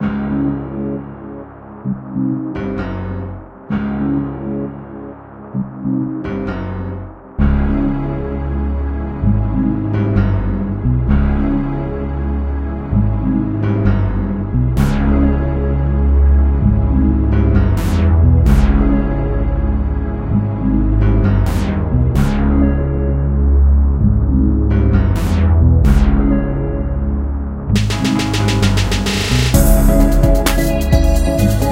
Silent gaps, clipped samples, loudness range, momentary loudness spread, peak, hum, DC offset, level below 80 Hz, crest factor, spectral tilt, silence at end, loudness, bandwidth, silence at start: none; under 0.1%; 8 LU; 11 LU; 0 dBFS; none; under 0.1%; -18 dBFS; 14 dB; -7 dB/octave; 0 s; -16 LUFS; 16 kHz; 0 s